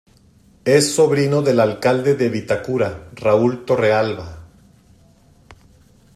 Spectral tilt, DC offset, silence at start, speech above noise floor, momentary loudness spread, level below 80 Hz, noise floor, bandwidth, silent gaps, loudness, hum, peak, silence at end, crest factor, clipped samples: -5 dB/octave; under 0.1%; 0.65 s; 35 dB; 9 LU; -52 dBFS; -52 dBFS; 14.5 kHz; none; -17 LUFS; none; -2 dBFS; 1.7 s; 18 dB; under 0.1%